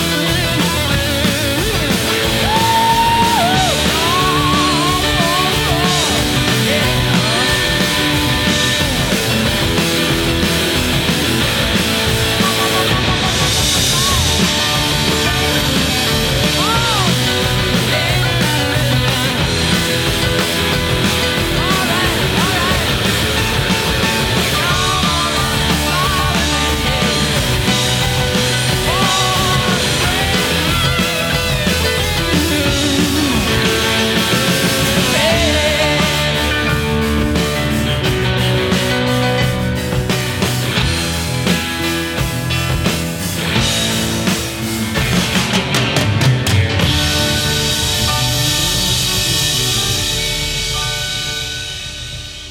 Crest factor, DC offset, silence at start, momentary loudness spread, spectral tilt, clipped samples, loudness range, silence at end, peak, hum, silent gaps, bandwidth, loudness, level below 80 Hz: 14 dB; under 0.1%; 0 s; 4 LU; -3.5 dB/octave; under 0.1%; 3 LU; 0 s; 0 dBFS; none; none; 19 kHz; -14 LUFS; -28 dBFS